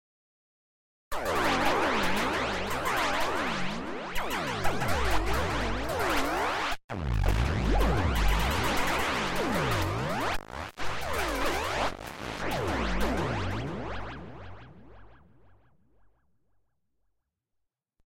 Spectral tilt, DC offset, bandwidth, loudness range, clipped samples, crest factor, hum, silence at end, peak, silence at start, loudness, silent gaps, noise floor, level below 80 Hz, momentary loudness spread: -4.5 dB/octave; under 0.1%; 16.5 kHz; 6 LU; under 0.1%; 18 dB; none; 3 s; -12 dBFS; 1.1 s; -30 LUFS; 6.84-6.89 s; -82 dBFS; -36 dBFS; 9 LU